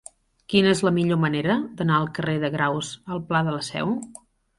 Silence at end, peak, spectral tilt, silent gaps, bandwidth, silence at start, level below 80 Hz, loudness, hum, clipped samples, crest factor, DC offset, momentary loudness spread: 0.45 s; -4 dBFS; -5.5 dB/octave; none; 11.5 kHz; 0.5 s; -58 dBFS; -23 LUFS; none; under 0.1%; 20 dB; under 0.1%; 10 LU